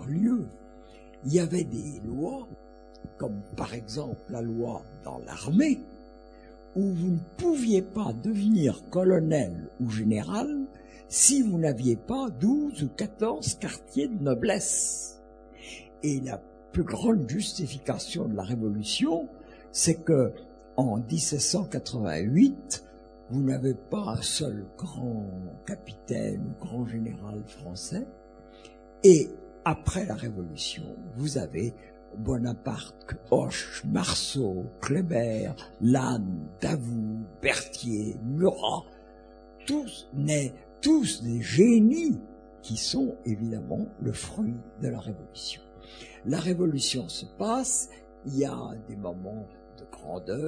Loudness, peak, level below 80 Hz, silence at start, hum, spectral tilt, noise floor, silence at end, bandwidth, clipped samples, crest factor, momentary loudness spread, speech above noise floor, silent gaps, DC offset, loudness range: -28 LUFS; -4 dBFS; -52 dBFS; 0 s; none; -5 dB/octave; -50 dBFS; 0 s; 10 kHz; under 0.1%; 24 dB; 15 LU; 23 dB; none; under 0.1%; 8 LU